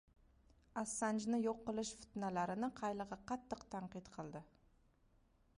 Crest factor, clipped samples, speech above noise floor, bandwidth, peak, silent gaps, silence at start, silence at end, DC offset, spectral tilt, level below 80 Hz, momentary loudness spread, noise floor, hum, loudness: 16 dB; under 0.1%; 31 dB; 11 kHz; -28 dBFS; none; 0.75 s; 1.15 s; under 0.1%; -5 dB/octave; -70 dBFS; 12 LU; -74 dBFS; none; -43 LUFS